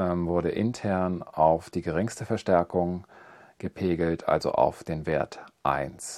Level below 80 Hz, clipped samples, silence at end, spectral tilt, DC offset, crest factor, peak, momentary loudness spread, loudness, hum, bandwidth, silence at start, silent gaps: -54 dBFS; under 0.1%; 0 s; -6.5 dB/octave; under 0.1%; 20 dB; -6 dBFS; 8 LU; -27 LUFS; none; 13.5 kHz; 0 s; none